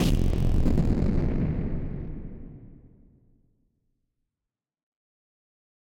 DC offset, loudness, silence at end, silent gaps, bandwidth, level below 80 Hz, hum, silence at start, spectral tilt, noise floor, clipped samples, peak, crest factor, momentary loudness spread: under 0.1%; -28 LUFS; 3.2 s; none; 15.5 kHz; -30 dBFS; none; 0 s; -7.5 dB/octave; -89 dBFS; under 0.1%; -10 dBFS; 18 dB; 19 LU